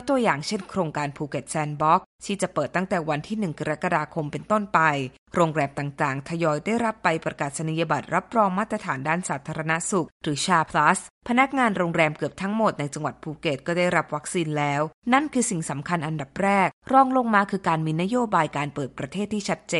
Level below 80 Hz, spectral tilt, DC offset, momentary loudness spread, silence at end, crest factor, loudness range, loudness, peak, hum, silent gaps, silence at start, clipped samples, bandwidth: -58 dBFS; -5 dB/octave; under 0.1%; 9 LU; 0 s; 20 dB; 3 LU; -24 LUFS; -4 dBFS; none; 2.06-2.19 s, 5.18-5.26 s, 10.12-10.21 s, 11.10-11.21 s, 14.94-15.02 s, 16.73-16.82 s; 0 s; under 0.1%; 11.5 kHz